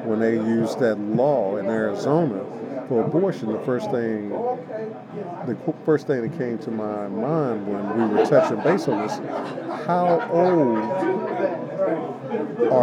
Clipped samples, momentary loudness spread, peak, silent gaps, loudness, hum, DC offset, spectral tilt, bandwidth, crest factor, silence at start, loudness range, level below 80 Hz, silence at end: under 0.1%; 10 LU; -4 dBFS; none; -23 LUFS; none; under 0.1%; -7.5 dB/octave; 11.5 kHz; 18 dB; 0 s; 5 LU; -82 dBFS; 0 s